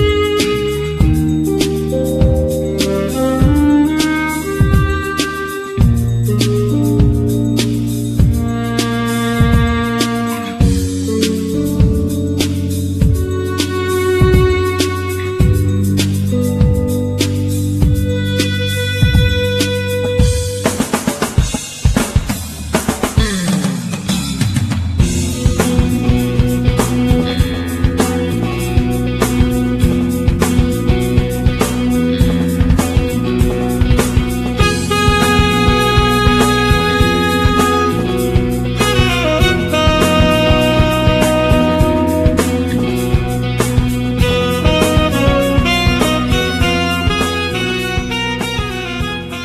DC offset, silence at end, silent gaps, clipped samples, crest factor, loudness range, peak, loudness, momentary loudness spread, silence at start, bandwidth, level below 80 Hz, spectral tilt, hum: under 0.1%; 0 s; none; under 0.1%; 14 dB; 4 LU; 0 dBFS; -14 LUFS; 6 LU; 0 s; 14 kHz; -22 dBFS; -5.5 dB/octave; none